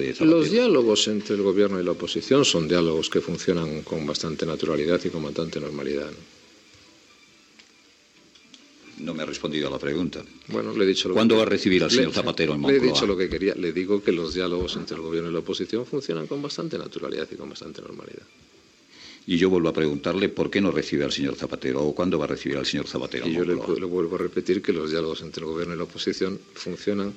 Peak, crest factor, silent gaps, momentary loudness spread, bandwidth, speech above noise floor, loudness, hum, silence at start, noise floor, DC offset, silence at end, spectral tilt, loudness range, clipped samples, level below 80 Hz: -6 dBFS; 18 dB; none; 12 LU; 8.6 kHz; 32 dB; -24 LUFS; none; 0 s; -56 dBFS; under 0.1%; 0 s; -5 dB/octave; 12 LU; under 0.1%; -54 dBFS